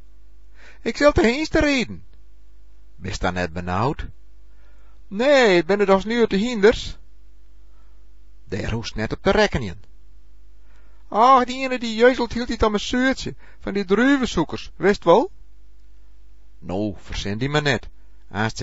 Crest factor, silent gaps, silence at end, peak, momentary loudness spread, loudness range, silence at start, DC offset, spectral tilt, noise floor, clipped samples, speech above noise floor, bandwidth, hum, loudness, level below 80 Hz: 20 dB; none; 0 s; -2 dBFS; 15 LU; 6 LU; 0.85 s; 2%; -5.5 dB/octave; -50 dBFS; under 0.1%; 30 dB; 8 kHz; none; -20 LUFS; -38 dBFS